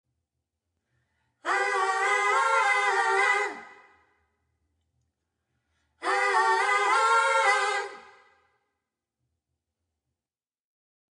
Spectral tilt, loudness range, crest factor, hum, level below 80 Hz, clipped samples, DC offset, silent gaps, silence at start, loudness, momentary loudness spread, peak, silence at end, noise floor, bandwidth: 0.5 dB/octave; 6 LU; 18 dB; none; -82 dBFS; under 0.1%; under 0.1%; none; 1.45 s; -24 LUFS; 11 LU; -12 dBFS; 3.1 s; under -90 dBFS; 11 kHz